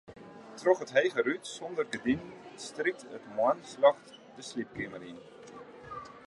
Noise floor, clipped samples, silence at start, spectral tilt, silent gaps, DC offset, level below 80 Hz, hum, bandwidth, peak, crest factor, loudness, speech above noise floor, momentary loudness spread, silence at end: -49 dBFS; under 0.1%; 0.1 s; -4.5 dB/octave; none; under 0.1%; -68 dBFS; none; 11.5 kHz; -10 dBFS; 22 dB; -31 LUFS; 18 dB; 22 LU; 0.1 s